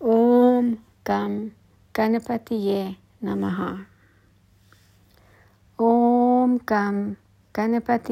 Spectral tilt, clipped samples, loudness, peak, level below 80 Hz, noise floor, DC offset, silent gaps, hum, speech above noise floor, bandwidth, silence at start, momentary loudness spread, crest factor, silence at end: -8 dB/octave; under 0.1%; -22 LUFS; -6 dBFS; -62 dBFS; -58 dBFS; under 0.1%; none; none; 34 dB; 16 kHz; 0 s; 15 LU; 16 dB; 0 s